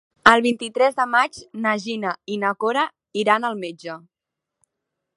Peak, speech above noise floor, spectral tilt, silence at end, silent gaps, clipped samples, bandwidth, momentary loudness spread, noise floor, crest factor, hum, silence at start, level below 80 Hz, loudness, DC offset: 0 dBFS; 63 dB; -4 dB/octave; 1.2 s; none; under 0.1%; 11.5 kHz; 16 LU; -85 dBFS; 22 dB; none; 0.25 s; -62 dBFS; -21 LUFS; under 0.1%